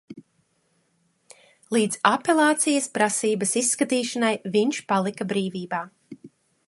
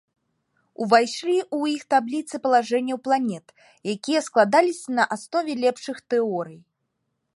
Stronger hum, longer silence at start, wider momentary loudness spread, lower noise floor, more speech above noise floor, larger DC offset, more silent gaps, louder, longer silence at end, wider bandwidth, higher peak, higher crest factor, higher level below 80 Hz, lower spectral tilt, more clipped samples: neither; second, 0.1 s vs 0.8 s; second, 8 LU vs 12 LU; second, -68 dBFS vs -77 dBFS; second, 46 dB vs 54 dB; neither; neither; about the same, -23 LUFS vs -23 LUFS; second, 0.4 s vs 0.8 s; about the same, 12 kHz vs 11.5 kHz; about the same, -2 dBFS vs -4 dBFS; about the same, 22 dB vs 20 dB; about the same, -74 dBFS vs -78 dBFS; about the same, -3.5 dB/octave vs -4 dB/octave; neither